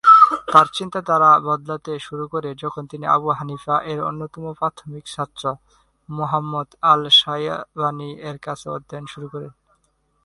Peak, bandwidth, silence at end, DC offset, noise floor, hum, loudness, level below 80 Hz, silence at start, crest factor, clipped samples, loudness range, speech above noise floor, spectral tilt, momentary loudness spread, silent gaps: 0 dBFS; 11.5 kHz; 0.75 s; under 0.1%; -65 dBFS; none; -19 LUFS; -60 dBFS; 0.05 s; 20 dB; under 0.1%; 7 LU; 44 dB; -4.5 dB/octave; 20 LU; none